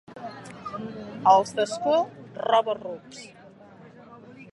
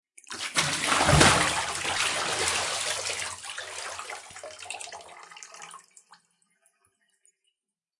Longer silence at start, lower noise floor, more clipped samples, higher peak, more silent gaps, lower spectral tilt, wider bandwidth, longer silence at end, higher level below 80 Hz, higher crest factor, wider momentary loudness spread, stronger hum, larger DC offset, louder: second, 0.1 s vs 0.3 s; second, -49 dBFS vs -85 dBFS; neither; about the same, -4 dBFS vs -4 dBFS; neither; first, -4 dB/octave vs -2.5 dB/octave; about the same, 11.5 kHz vs 11.5 kHz; second, 0.1 s vs 2.2 s; second, -68 dBFS vs -48 dBFS; about the same, 22 dB vs 26 dB; about the same, 23 LU vs 24 LU; neither; neither; about the same, -24 LUFS vs -25 LUFS